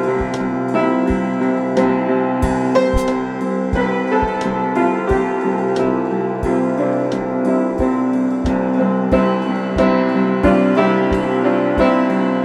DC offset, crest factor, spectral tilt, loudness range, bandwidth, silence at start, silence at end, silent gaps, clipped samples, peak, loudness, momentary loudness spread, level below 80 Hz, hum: under 0.1%; 14 dB; -7.5 dB/octave; 2 LU; 11 kHz; 0 s; 0 s; none; under 0.1%; -2 dBFS; -17 LUFS; 5 LU; -32 dBFS; none